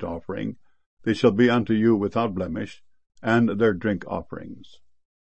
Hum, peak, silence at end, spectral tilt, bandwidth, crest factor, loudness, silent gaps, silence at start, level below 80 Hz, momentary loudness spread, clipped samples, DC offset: none; -6 dBFS; 0.7 s; -7.5 dB/octave; 8.6 kHz; 18 dB; -23 LUFS; 0.86-0.97 s; 0 s; -54 dBFS; 14 LU; under 0.1%; 0.4%